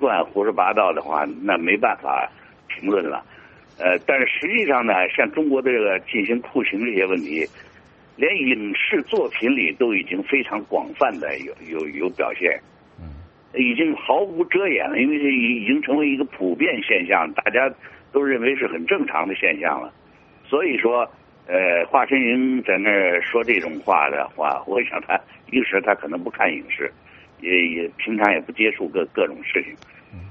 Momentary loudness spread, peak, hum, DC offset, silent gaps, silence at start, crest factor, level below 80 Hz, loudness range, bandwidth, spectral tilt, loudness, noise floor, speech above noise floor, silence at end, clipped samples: 8 LU; 0 dBFS; none; under 0.1%; none; 0 s; 22 dB; -60 dBFS; 3 LU; 6.4 kHz; -2 dB/octave; -20 LUFS; -50 dBFS; 29 dB; 0 s; under 0.1%